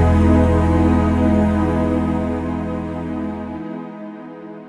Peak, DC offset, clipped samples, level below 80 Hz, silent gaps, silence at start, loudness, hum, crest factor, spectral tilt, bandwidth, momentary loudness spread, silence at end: -4 dBFS; under 0.1%; under 0.1%; -26 dBFS; none; 0 s; -18 LUFS; none; 14 dB; -9 dB/octave; 9.8 kHz; 18 LU; 0 s